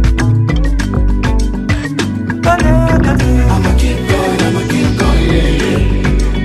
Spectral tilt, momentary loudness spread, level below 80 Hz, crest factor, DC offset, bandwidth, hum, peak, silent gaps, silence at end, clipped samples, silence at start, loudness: -6.5 dB/octave; 5 LU; -14 dBFS; 10 dB; under 0.1%; 13 kHz; none; 0 dBFS; none; 0 s; under 0.1%; 0 s; -13 LUFS